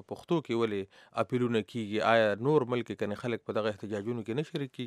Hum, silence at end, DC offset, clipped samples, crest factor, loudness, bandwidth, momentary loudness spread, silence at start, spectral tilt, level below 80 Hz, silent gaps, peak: none; 0 s; under 0.1%; under 0.1%; 22 dB; -31 LUFS; 13 kHz; 9 LU; 0.1 s; -6.5 dB/octave; -76 dBFS; none; -10 dBFS